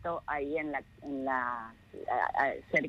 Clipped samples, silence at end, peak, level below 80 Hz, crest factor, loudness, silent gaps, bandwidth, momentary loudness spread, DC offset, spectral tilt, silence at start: under 0.1%; 0 s; -14 dBFS; -62 dBFS; 20 dB; -33 LUFS; none; 11 kHz; 12 LU; under 0.1%; -6.5 dB/octave; 0 s